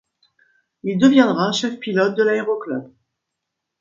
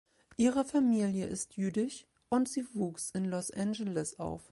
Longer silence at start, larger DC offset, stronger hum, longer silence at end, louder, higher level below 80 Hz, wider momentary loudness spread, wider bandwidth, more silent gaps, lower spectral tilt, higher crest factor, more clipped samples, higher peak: first, 0.85 s vs 0.4 s; neither; neither; first, 0.95 s vs 0.1 s; first, -18 LUFS vs -33 LUFS; about the same, -66 dBFS vs -64 dBFS; first, 14 LU vs 9 LU; second, 7.6 kHz vs 11.5 kHz; neither; about the same, -5.5 dB/octave vs -5.5 dB/octave; about the same, 20 dB vs 16 dB; neither; first, 0 dBFS vs -16 dBFS